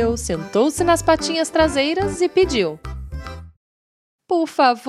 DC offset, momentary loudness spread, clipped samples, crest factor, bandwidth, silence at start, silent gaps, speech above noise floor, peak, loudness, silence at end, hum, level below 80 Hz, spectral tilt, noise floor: under 0.1%; 16 LU; under 0.1%; 18 dB; 13.5 kHz; 0 s; 3.57-4.19 s; over 72 dB; -2 dBFS; -19 LUFS; 0 s; none; -36 dBFS; -4.5 dB/octave; under -90 dBFS